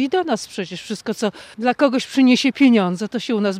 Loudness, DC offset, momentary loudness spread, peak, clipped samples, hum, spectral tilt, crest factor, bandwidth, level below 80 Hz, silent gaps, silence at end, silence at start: -19 LUFS; under 0.1%; 13 LU; -4 dBFS; under 0.1%; none; -5 dB/octave; 14 dB; 14 kHz; -66 dBFS; none; 0 s; 0 s